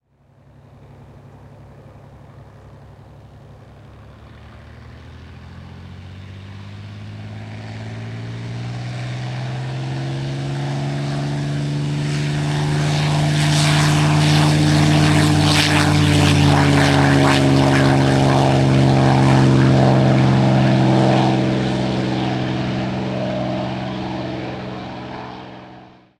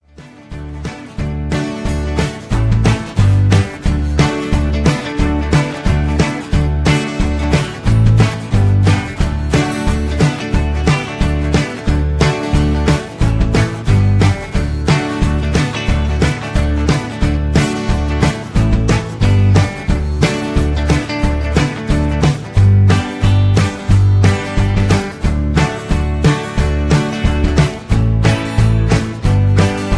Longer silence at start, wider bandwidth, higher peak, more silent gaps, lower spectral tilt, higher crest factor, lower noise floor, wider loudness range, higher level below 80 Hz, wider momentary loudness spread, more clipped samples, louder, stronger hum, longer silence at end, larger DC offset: first, 1.45 s vs 0.2 s; first, 13 kHz vs 11 kHz; about the same, -2 dBFS vs 0 dBFS; neither; about the same, -6 dB/octave vs -6.5 dB/octave; about the same, 16 dB vs 14 dB; first, -52 dBFS vs -38 dBFS; first, 18 LU vs 3 LU; second, -42 dBFS vs -20 dBFS; first, 20 LU vs 6 LU; neither; about the same, -16 LUFS vs -15 LUFS; neither; first, 0.35 s vs 0 s; neither